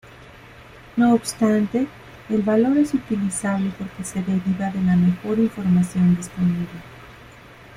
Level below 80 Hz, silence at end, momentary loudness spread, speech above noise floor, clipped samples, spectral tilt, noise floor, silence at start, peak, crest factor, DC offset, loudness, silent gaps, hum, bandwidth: -50 dBFS; 0.25 s; 11 LU; 24 dB; under 0.1%; -7 dB/octave; -44 dBFS; 0.1 s; -6 dBFS; 14 dB; under 0.1%; -21 LUFS; none; none; 14 kHz